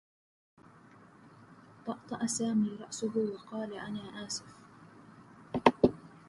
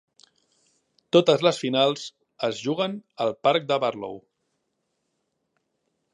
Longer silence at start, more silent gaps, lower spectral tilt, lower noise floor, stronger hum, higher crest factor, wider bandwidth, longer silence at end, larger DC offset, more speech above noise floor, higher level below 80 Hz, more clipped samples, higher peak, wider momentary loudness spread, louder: about the same, 1.25 s vs 1.15 s; neither; about the same, -4.5 dB/octave vs -5 dB/octave; second, -58 dBFS vs -77 dBFS; neither; first, 30 dB vs 22 dB; about the same, 11.5 kHz vs 11 kHz; second, 0.1 s vs 1.95 s; neither; second, 22 dB vs 53 dB; first, -66 dBFS vs -76 dBFS; neither; about the same, -6 dBFS vs -4 dBFS; about the same, 14 LU vs 16 LU; second, -33 LUFS vs -24 LUFS